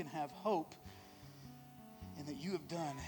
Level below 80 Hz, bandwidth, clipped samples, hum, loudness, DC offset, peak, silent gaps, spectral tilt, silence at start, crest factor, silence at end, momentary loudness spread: -68 dBFS; 19 kHz; under 0.1%; none; -43 LUFS; under 0.1%; -24 dBFS; none; -5.5 dB/octave; 0 s; 20 dB; 0 s; 18 LU